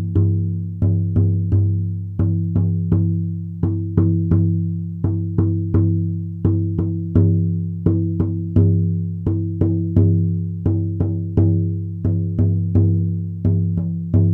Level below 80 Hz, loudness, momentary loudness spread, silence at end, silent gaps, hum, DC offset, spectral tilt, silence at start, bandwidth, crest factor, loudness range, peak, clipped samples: -38 dBFS; -19 LUFS; 6 LU; 0 s; none; none; under 0.1%; -13.5 dB/octave; 0 s; 1.6 kHz; 16 dB; 1 LU; -2 dBFS; under 0.1%